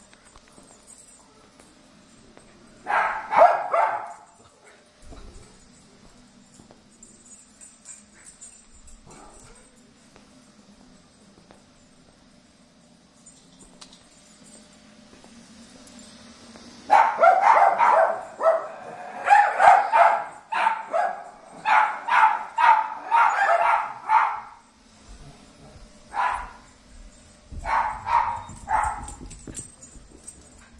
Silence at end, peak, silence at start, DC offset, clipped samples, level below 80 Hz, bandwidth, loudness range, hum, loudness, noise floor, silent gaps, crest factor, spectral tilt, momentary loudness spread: 0.5 s; -2 dBFS; 2.85 s; under 0.1%; under 0.1%; -52 dBFS; 11.5 kHz; 11 LU; none; -21 LUFS; -55 dBFS; none; 22 dB; -3 dB/octave; 27 LU